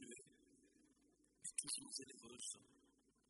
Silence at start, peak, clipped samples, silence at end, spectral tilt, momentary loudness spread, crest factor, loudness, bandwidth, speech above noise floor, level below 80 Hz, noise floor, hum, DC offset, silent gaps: 0 s; -26 dBFS; under 0.1%; 0.5 s; -0.5 dB/octave; 14 LU; 30 dB; -49 LUFS; 11.5 kHz; 22 dB; -88 dBFS; -78 dBFS; none; under 0.1%; none